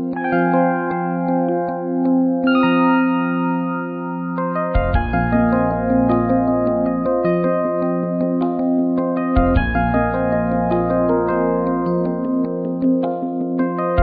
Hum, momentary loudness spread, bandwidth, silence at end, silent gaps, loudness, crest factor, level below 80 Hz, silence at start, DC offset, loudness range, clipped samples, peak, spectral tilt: none; 5 LU; 4.7 kHz; 0 s; none; -18 LUFS; 16 dB; -30 dBFS; 0 s; under 0.1%; 1 LU; under 0.1%; -2 dBFS; -11.5 dB/octave